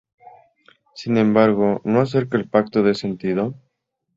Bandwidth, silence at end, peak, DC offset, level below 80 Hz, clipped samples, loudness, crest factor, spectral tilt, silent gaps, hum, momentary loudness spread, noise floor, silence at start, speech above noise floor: 7.6 kHz; 0.65 s; -2 dBFS; under 0.1%; -58 dBFS; under 0.1%; -19 LUFS; 18 dB; -8 dB/octave; none; none; 8 LU; -74 dBFS; 0.95 s; 56 dB